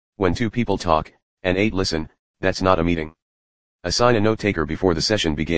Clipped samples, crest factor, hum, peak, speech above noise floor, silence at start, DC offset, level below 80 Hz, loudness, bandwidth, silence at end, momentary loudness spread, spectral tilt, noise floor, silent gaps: under 0.1%; 20 dB; none; 0 dBFS; over 70 dB; 0.1 s; 1%; -38 dBFS; -21 LUFS; 10 kHz; 0 s; 10 LU; -5 dB/octave; under -90 dBFS; 1.23-1.37 s, 2.19-2.34 s, 3.22-3.79 s